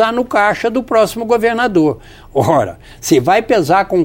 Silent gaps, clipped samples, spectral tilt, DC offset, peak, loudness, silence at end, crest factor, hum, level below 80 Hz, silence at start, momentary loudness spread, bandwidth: none; under 0.1%; -5 dB/octave; under 0.1%; 0 dBFS; -14 LUFS; 0 s; 14 dB; none; -42 dBFS; 0 s; 7 LU; 17 kHz